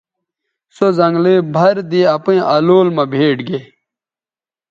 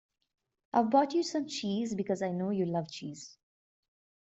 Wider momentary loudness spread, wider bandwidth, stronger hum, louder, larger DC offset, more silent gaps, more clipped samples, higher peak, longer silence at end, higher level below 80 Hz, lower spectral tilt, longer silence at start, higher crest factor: second, 6 LU vs 16 LU; second, 7.4 kHz vs 8.2 kHz; neither; first, -13 LUFS vs -31 LUFS; neither; neither; neither; first, 0 dBFS vs -14 dBFS; first, 1.05 s vs 0.9 s; first, -62 dBFS vs -76 dBFS; first, -8 dB/octave vs -5.5 dB/octave; about the same, 0.8 s vs 0.75 s; second, 14 dB vs 20 dB